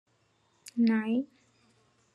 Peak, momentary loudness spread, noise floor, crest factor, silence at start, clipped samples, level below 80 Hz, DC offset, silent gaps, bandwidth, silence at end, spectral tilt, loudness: -14 dBFS; 19 LU; -70 dBFS; 18 dB; 0.65 s; under 0.1%; -84 dBFS; under 0.1%; none; 12 kHz; 0.9 s; -6.5 dB/octave; -29 LUFS